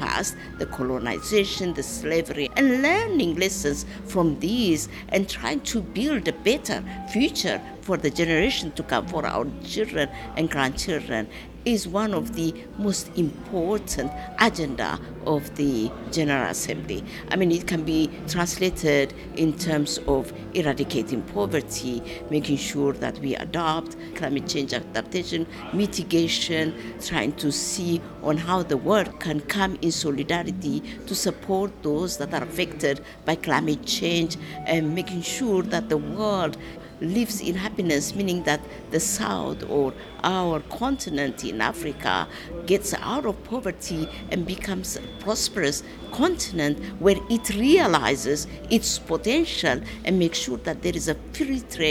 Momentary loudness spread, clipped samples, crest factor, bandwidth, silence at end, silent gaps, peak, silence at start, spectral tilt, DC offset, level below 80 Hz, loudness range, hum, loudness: 7 LU; under 0.1%; 22 dB; 17.5 kHz; 0 s; none; -2 dBFS; 0 s; -4 dB/octave; under 0.1%; -44 dBFS; 4 LU; none; -25 LUFS